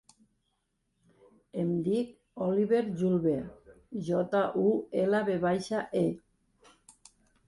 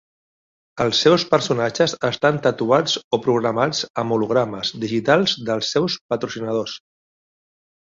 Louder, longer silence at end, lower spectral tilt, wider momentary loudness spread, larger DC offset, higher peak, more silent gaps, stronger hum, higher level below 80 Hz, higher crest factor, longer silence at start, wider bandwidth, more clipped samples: second, -30 LUFS vs -20 LUFS; first, 1.3 s vs 1.15 s; first, -7.5 dB/octave vs -4.5 dB/octave; first, 12 LU vs 8 LU; neither; second, -14 dBFS vs -2 dBFS; second, none vs 3.04-3.11 s, 3.90-3.94 s, 6.01-6.09 s; neither; second, -66 dBFS vs -60 dBFS; about the same, 16 dB vs 18 dB; first, 1.55 s vs 0.75 s; first, 11.5 kHz vs 7.8 kHz; neither